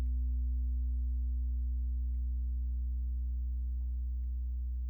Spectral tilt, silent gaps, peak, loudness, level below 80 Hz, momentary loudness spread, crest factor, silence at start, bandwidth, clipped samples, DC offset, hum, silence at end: -11.5 dB/octave; none; -28 dBFS; -37 LUFS; -34 dBFS; 3 LU; 6 dB; 0 s; 0.4 kHz; under 0.1%; under 0.1%; none; 0 s